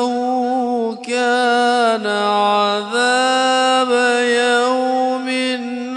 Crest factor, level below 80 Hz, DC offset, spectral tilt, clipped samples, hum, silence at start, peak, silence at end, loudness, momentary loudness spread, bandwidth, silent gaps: 12 dB; -80 dBFS; under 0.1%; -2.5 dB/octave; under 0.1%; none; 0 s; -4 dBFS; 0 s; -16 LUFS; 5 LU; 11 kHz; none